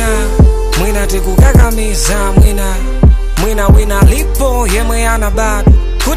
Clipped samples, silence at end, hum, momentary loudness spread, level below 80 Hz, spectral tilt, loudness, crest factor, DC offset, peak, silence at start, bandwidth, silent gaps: 0.4%; 0 s; none; 6 LU; -10 dBFS; -5.5 dB/octave; -11 LUFS; 8 dB; under 0.1%; 0 dBFS; 0 s; 15.5 kHz; none